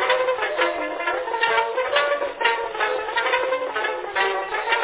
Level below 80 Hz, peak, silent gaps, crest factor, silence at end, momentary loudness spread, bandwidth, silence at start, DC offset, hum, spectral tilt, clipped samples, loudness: -60 dBFS; -4 dBFS; none; 18 dB; 0 s; 4 LU; 4 kHz; 0 s; under 0.1%; none; -5 dB/octave; under 0.1%; -22 LUFS